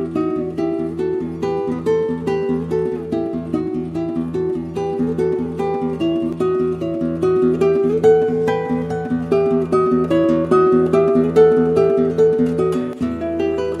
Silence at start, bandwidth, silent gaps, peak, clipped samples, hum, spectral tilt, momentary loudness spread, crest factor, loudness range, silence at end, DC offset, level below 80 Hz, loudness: 0 s; 10.5 kHz; none; -2 dBFS; under 0.1%; none; -8.5 dB/octave; 8 LU; 16 dB; 6 LU; 0 s; under 0.1%; -46 dBFS; -18 LUFS